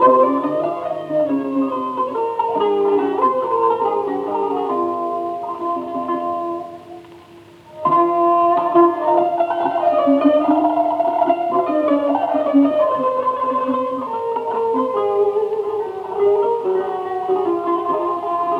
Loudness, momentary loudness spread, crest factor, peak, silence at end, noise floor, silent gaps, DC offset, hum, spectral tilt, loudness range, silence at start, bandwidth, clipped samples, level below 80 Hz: -18 LUFS; 9 LU; 16 dB; -2 dBFS; 0 s; -43 dBFS; none; under 0.1%; none; -7.5 dB/octave; 6 LU; 0 s; 6 kHz; under 0.1%; -66 dBFS